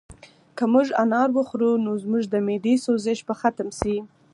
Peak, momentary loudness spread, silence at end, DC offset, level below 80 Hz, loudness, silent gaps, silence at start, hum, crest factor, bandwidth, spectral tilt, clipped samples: -4 dBFS; 7 LU; 0.3 s; under 0.1%; -52 dBFS; -23 LUFS; none; 0.1 s; none; 18 dB; 11.5 kHz; -6 dB/octave; under 0.1%